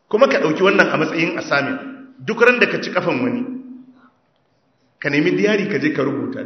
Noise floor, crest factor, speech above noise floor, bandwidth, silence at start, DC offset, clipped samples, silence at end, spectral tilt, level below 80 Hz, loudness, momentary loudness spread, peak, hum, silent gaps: -63 dBFS; 18 dB; 45 dB; 8 kHz; 0.1 s; under 0.1%; under 0.1%; 0 s; -5.5 dB/octave; -68 dBFS; -17 LUFS; 13 LU; 0 dBFS; none; none